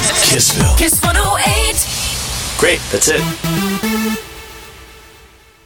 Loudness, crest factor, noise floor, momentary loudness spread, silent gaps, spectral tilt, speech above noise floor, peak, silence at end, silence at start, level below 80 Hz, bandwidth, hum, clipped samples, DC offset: -13 LUFS; 16 dB; -44 dBFS; 12 LU; none; -2.5 dB/octave; 30 dB; 0 dBFS; 0.65 s; 0 s; -24 dBFS; over 20 kHz; none; under 0.1%; under 0.1%